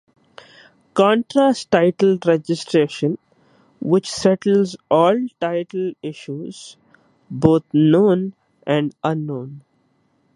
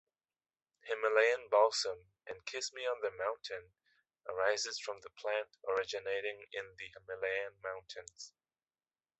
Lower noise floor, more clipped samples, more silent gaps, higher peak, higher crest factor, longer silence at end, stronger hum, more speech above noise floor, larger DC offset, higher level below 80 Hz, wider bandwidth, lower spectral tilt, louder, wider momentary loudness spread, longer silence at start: second, -63 dBFS vs under -90 dBFS; neither; neither; first, 0 dBFS vs -16 dBFS; about the same, 18 dB vs 22 dB; second, 0.75 s vs 0.9 s; neither; second, 45 dB vs over 53 dB; neither; first, -56 dBFS vs -78 dBFS; first, 11.5 kHz vs 8.2 kHz; first, -6.5 dB/octave vs -0.5 dB/octave; first, -18 LUFS vs -36 LUFS; second, 15 LU vs 19 LU; about the same, 0.95 s vs 0.85 s